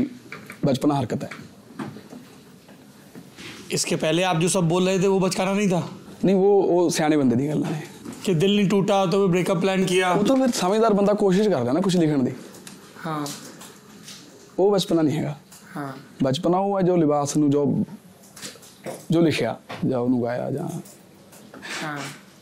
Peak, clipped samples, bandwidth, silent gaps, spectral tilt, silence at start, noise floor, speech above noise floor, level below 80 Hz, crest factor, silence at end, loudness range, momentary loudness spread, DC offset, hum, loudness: -8 dBFS; under 0.1%; 16 kHz; none; -5.5 dB/octave; 0 s; -47 dBFS; 27 dB; -60 dBFS; 14 dB; 0.25 s; 6 LU; 19 LU; under 0.1%; none; -22 LUFS